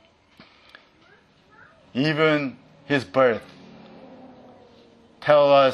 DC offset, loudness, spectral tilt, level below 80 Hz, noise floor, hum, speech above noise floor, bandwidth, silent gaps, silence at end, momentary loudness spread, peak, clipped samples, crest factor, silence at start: under 0.1%; -21 LUFS; -6.5 dB/octave; -68 dBFS; -56 dBFS; none; 37 dB; 10.5 kHz; none; 0 s; 15 LU; -2 dBFS; under 0.1%; 22 dB; 1.95 s